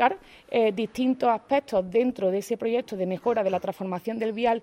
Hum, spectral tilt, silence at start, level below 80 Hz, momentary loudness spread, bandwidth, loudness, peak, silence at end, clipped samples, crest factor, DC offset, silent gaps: none; -6 dB/octave; 0 s; -64 dBFS; 6 LU; 15.5 kHz; -26 LUFS; -8 dBFS; 0 s; under 0.1%; 18 dB; under 0.1%; none